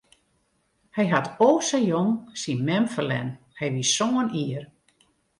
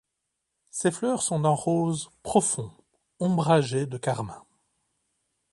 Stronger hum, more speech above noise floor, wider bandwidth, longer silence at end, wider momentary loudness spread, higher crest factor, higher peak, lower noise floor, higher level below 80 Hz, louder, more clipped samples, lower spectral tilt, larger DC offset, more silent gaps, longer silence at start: neither; second, 46 dB vs 56 dB; about the same, 11.5 kHz vs 11.5 kHz; second, 0.75 s vs 1.1 s; about the same, 11 LU vs 10 LU; about the same, 20 dB vs 20 dB; about the same, -6 dBFS vs -8 dBFS; second, -69 dBFS vs -81 dBFS; about the same, -66 dBFS vs -62 dBFS; about the same, -24 LUFS vs -26 LUFS; neither; about the same, -4.5 dB/octave vs -5.5 dB/octave; neither; neither; first, 0.95 s vs 0.75 s